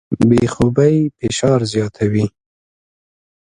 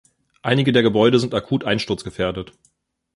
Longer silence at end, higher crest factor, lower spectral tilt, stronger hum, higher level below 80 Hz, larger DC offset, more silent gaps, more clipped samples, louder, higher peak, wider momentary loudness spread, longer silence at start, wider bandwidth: first, 1.15 s vs 0.7 s; about the same, 16 dB vs 18 dB; about the same, -6.5 dB/octave vs -6 dB/octave; neither; first, -42 dBFS vs -50 dBFS; neither; neither; neither; first, -16 LUFS vs -19 LUFS; about the same, 0 dBFS vs -2 dBFS; second, 6 LU vs 13 LU; second, 0.1 s vs 0.45 s; about the same, 11.5 kHz vs 11.5 kHz